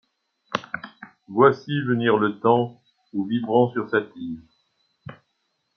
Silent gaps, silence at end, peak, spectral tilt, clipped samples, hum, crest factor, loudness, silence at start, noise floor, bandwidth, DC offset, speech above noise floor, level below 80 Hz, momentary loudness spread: none; 0.6 s; -2 dBFS; -7.5 dB/octave; under 0.1%; none; 22 dB; -22 LUFS; 0.5 s; -74 dBFS; 6.6 kHz; under 0.1%; 52 dB; -68 dBFS; 20 LU